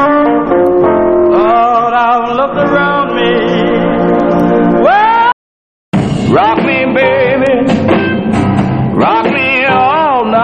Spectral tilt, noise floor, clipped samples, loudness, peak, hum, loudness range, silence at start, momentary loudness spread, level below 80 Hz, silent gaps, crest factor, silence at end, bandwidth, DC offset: -7.5 dB/octave; under -90 dBFS; under 0.1%; -10 LUFS; 0 dBFS; none; 1 LU; 0 s; 4 LU; -38 dBFS; 5.33-5.92 s; 10 dB; 0 s; 9.2 kHz; under 0.1%